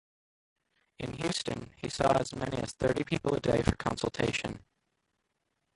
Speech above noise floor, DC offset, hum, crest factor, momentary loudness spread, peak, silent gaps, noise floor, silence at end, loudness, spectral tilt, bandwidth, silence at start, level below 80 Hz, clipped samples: 49 dB; under 0.1%; none; 24 dB; 11 LU; -10 dBFS; none; -81 dBFS; 1.2 s; -32 LUFS; -5 dB/octave; 11.5 kHz; 1 s; -50 dBFS; under 0.1%